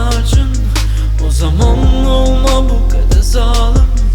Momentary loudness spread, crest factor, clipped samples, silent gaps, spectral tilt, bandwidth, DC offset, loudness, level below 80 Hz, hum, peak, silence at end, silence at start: 4 LU; 10 dB; under 0.1%; none; -5.5 dB/octave; 13 kHz; under 0.1%; -13 LUFS; -10 dBFS; none; 0 dBFS; 0 s; 0 s